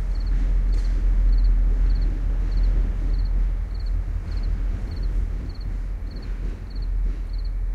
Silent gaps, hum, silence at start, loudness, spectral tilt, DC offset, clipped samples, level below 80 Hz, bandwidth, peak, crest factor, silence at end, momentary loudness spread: none; none; 0 s; -27 LUFS; -7.5 dB/octave; under 0.1%; under 0.1%; -22 dBFS; 4.7 kHz; -12 dBFS; 10 dB; 0 s; 9 LU